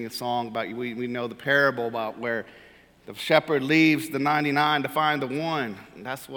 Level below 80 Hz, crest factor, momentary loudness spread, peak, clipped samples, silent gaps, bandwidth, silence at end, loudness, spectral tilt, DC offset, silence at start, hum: -68 dBFS; 22 dB; 13 LU; -2 dBFS; under 0.1%; none; 19 kHz; 0 s; -24 LUFS; -5 dB/octave; under 0.1%; 0 s; none